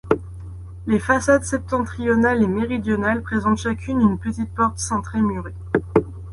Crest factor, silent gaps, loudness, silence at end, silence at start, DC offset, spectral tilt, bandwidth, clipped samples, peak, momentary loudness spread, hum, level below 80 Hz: 18 dB; none; -21 LUFS; 0 s; 0.05 s; under 0.1%; -6 dB/octave; 11.5 kHz; under 0.1%; -2 dBFS; 8 LU; none; -38 dBFS